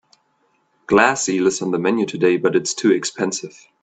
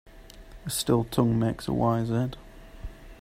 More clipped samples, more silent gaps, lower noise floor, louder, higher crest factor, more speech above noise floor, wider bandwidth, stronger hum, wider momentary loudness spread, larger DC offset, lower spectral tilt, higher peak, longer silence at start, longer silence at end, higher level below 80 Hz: neither; neither; first, -64 dBFS vs -46 dBFS; first, -18 LUFS vs -27 LUFS; about the same, 18 dB vs 18 dB; first, 46 dB vs 21 dB; second, 9.2 kHz vs 16 kHz; neither; second, 8 LU vs 21 LU; neither; second, -4 dB/octave vs -6 dB/octave; first, 0 dBFS vs -10 dBFS; first, 0.9 s vs 0.05 s; first, 0.35 s vs 0.05 s; second, -60 dBFS vs -46 dBFS